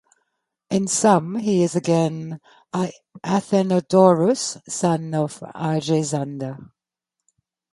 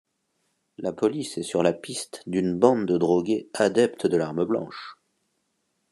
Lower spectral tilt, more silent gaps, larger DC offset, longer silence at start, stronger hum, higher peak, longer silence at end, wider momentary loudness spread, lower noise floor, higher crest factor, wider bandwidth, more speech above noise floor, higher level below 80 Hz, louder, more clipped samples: about the same, -5.5 dB/octave vs -5.5 dB/octave; neither; neither; about the same, 0.7 s vs 0.8 s; neither; first, 0 dBFS vs -4 dBFS; about the same, 1.1 s vs 1 s; first, 16 LU vs 12 LU; first, -84 dBFS vs -74 dBFS; about the same, 20 dB vs 22 dB; about the same, 11.5 kHz vs 12.5 kHz; first, 64 dB vs 51 dB; about the same, -66 dBFS vs -68 dBFS; first, -21 LUFS vs -25 LUFS; neither